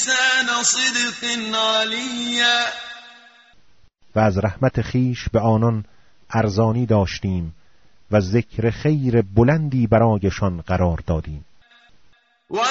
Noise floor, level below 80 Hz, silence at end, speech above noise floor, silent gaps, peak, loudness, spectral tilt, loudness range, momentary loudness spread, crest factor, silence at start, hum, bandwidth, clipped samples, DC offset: -59 dBFS; -40 dBFS; 0 s; 40 dB; none; -4 dBFS; -19 LUFS; -4 dB/octave; 3 LU; 10 LU; 18 dB; 0 s; none; 8 kHz; under 0.1%; under 0.1%